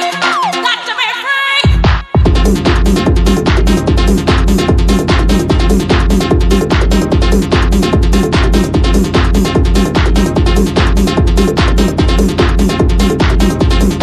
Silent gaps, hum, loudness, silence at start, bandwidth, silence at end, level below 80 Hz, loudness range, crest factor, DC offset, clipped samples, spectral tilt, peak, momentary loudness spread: none; none; -11 LUFS; 0 s; 13.5 kHz; 0 s; -12 dBFS; 0 LU; 10 dB; under 0.1%; under 0.1%; -6 dB/octave; 0 dBFS; 1 LU